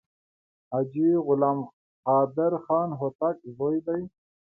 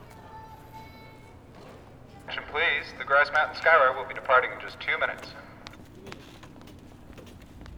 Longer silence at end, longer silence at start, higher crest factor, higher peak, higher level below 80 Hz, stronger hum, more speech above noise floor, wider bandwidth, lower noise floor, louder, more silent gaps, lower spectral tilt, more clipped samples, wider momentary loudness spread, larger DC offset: first, 0.4 s vs 0 s; first, 0.7 s vs 0 s; about the same, 18 dB vs 20 dB; about the same, -10 dBFS vs -8 dBFS; second, -70 dBFS vs -56 dBFS; neither; first, over 65 dB vs 24 dB; second, 2.7 kHz vs 18.5 kHz; first, under -90 dBFS vs -49 dBFS; about the same, -26 LUFS vs -24 LUFS; first, 1.73-2.03 s, 3.15-3.19 s vs none; first, -13.5 dB/octave vs -4 dB/octave; neither; second, 10 LU vs 26 LU; neither